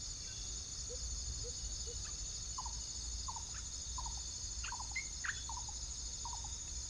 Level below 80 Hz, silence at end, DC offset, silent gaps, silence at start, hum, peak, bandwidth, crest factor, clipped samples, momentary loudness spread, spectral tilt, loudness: -50 dBFS; 0 s; under 0.1%; none; 0 s; none; -26 dBFS; 10.5 kHz; 16 dB; under 0.1%; 2 LU; -1 dB/octave; -42 LUFS